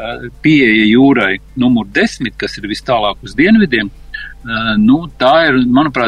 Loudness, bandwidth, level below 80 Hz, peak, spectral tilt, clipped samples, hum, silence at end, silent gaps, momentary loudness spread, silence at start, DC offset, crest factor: -12 LUFS; 10 kHz; -36 dBFS; 0 dBFS; -6 dB/octave; under 0.1%; none; 0 s; none; 13 LU; 0 s; under 0.1%; 12 dB